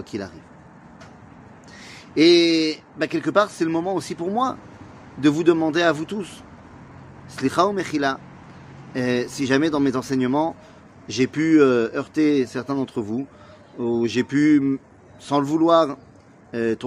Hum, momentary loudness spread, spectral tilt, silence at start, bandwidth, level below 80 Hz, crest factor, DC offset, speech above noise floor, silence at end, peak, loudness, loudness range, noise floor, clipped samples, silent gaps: none; 19 LU; -5.5 dB/octave; 0 s; 12 kHz; -60 dBFS; 20 dB; under 0.1%; 25 dB; 0 s; -2 dBFS; -21 LUFS; 3 LU; -46 dBFS; under 0.1%; none